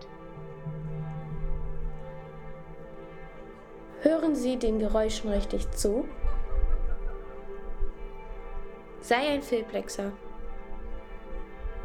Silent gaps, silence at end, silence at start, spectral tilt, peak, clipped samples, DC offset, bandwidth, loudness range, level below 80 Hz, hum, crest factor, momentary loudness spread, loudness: none; 0 s; 0 s; -5.5 dB/octave; -8 dBFS; under 0.1%; under 0.1%; 14 kHz; 11 LU; -34 dBFS; none; 22 dB; 18 LU; -31 LUFS